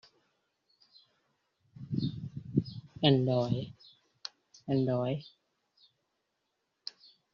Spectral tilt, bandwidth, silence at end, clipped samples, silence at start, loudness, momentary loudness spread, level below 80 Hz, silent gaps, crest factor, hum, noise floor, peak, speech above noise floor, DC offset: -6.5 dB/octave; 6.8 kHz; 2.05 s; under 0.1%; 1.8 s; -32 LUFS; 19 LU; -66 dBFS; none; 24 dB; none; -82 dBFS; -12 dBFS; 53 dB; under 0.1%